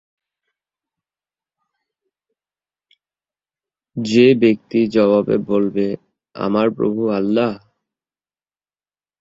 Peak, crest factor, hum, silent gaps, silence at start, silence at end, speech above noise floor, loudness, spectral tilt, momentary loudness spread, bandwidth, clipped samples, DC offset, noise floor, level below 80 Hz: -2 dBFS; 18 dB; none; none; 3.95 s; 1.65 s; over 74 dB; -17 LUFS; -7 dB/octave; 13 LU; 7.8 kHz; under 0.1%; under 0.1%; under -90 dBFS; -60 dBFS